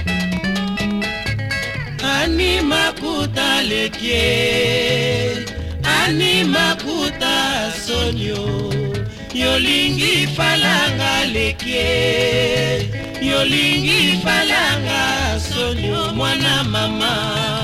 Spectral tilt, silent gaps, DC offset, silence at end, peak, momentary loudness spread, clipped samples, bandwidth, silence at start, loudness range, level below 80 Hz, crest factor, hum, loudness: -4 dB/octave; none; under 0.1%; 0 s; -4 dBFS; 8 LU; under 0.1%; 16.5 kHz; 0 s; 3 LU; -34 dBFS; 14 dB; none; -17 LUFS